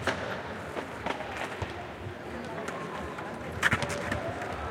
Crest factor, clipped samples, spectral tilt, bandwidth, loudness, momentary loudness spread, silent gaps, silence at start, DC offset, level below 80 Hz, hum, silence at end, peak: 26 dB; under 0.1%; -4.5 dB/octave; 16.5 kHz; -34 LUFS; 11 LU; none; 0 s; under 0.1%; -52 dBFS; none; 0 s; -8 dBFS